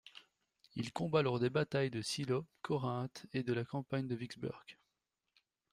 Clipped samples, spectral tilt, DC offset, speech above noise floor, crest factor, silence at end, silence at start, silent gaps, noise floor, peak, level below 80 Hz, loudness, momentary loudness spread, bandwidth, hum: under 0.1%; -6 dB/octave; under 0.1%; 50 dB; 20 dB; 1 s; 0.05 s; none; -87 dBFS; -18 dBFS; -72 dBFS; -38 LUFS; 11 LU; 14.5 kHz; none